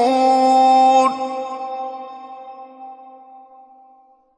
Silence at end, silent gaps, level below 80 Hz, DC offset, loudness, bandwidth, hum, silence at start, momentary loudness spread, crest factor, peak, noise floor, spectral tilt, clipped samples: 1.35 s; none; -76 dBFS; under 0.1%; -16 LUFS; 10.5 kHz; none; 0 s; 25 LU; 14 dB; -4 dBFS; -52 dBFS; -3 dB/octave; under 0.1%